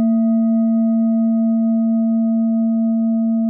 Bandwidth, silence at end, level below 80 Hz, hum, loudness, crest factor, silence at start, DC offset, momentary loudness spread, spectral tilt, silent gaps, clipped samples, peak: 1.3 kHz; 0 s; -84 dBFS; none; -17 LUFS; 6 dB; 0 s; under 0.1%; 2 LU; -12 dB/octave; none; under 0.1%; -10 dBFS